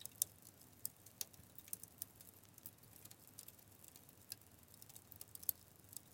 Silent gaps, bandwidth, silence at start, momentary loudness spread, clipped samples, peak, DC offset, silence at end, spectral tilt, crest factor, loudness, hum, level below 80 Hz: none; 17 kHz; 0 s; 17 LU; under 0.1%; -16 dBFS; under 0.1%; 0 s; -1 dB/octave; 38 dB; -50 LUFS; none; -82 dBFS